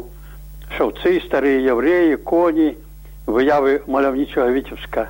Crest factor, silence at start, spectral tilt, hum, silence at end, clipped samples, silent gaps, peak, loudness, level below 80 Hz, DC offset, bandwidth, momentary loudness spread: 12 dB; 0 s; -6.5 dB/octave; none; 0 s; under 0.1%; none; -6 dBFS; -18 LUFS; -38 dBFS; under 0.1%; 16.5 kHz; 10 LU